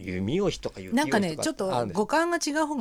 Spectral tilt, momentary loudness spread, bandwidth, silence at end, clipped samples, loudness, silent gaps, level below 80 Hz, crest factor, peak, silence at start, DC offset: -4.5 dB/octave; 4 LU; 16 kHz; 0 s; under 0.1%; -27 LUFS; none; -52 dBFS; 16 dB; -10 dBFS; 0 s; under 0.1%